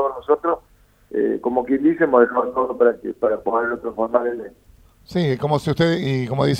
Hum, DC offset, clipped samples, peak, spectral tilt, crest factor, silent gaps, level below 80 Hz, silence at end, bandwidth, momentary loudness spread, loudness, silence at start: none; under 0.1%; under 0.1%; -2 dBFS; -7.5 dB/octave; 18 dB; none; -52 dBFS; 0 s; 13.5 kHz; 9 LU; -20 LUFS; 0 s